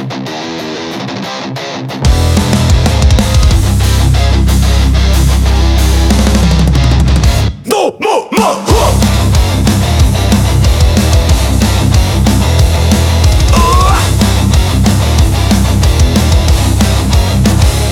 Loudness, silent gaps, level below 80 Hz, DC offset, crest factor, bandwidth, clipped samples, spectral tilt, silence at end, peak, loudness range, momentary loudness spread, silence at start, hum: -10 LUFS; none; -12 dBFS; under 0.1%; 8 dB; 16.5 kHz; 0.2%; -5.5 dB/octave; 0 s; 0 dBFS; 1 LU; 5 LU; 0 s; none